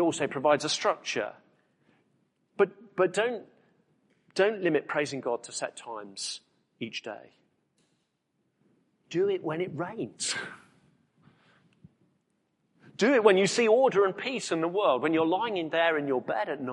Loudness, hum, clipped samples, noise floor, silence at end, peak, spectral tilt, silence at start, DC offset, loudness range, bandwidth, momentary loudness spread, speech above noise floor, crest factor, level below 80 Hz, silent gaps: -28 LUFS; none; under 0.1%; -77 dBFS; 0 s; -6 dBFS; -4 dB/octave; 0 s; under 0.1%; 13 LU; 11.5 kHz; 15 LU; 49 dB; 24 dB; -78 dBFS; none